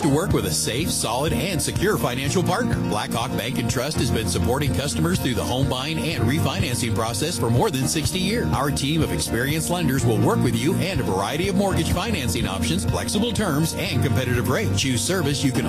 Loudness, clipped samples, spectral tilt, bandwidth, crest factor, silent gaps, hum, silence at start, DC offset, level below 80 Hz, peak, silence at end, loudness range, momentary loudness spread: -22 LUFS; under 0.1%; -4.5 dB/octave; 15.5 kHz; 14 dB; none; none; 0 s; under 0.1%; -38 dBFS; -8 dBFS; 0 s; 1 LU; 3 LU